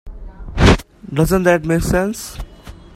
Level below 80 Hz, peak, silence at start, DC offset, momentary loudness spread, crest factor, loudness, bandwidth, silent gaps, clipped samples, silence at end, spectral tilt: -26 dBFS; 0 dBFS; 0.05 s; under 0.1%; 20 LU; 18 dB; -16 LUFS; 16 kHz; none; under 0.1%; 0.25 s; -6 dB/octave